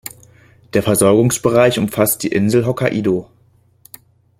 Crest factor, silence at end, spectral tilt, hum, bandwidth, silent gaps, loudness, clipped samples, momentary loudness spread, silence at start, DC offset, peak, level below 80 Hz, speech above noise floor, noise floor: 16 dB; 1.15 s; -5 dB/octave; none; 16.5 kHz; none; -15 LUFS; under 0.1%; 7 LU; 0.75 s; under 0.1%; 0 dBFS; -50 dBFS; 39 dB; -54 dBFS